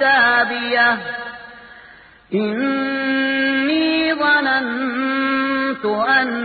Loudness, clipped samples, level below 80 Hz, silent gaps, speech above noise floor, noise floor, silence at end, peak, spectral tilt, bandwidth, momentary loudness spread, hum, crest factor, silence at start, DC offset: -17 LUFS; under 0.1%; -58 dBFS; none; 28 dB; -45 dBFS; 0 s; -4 dBFS; -9 dB/octave; 4.8 kHz; 9 LU; none; 16 dB; 0 s; under 0.1%